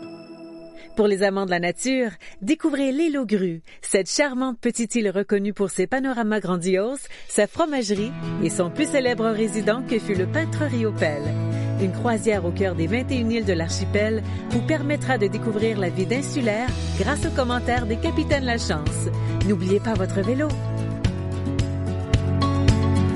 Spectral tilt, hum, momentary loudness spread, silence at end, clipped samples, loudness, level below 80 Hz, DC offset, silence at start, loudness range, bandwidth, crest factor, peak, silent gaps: -5.5 dB/octave; none; 5 LU; 0 s; under 0.1%; -23 LUFS; -38 dBFS; under 0.1%; 0 s; 1 LU; 11.5 kHz; 18 dB; -6 dBFS; none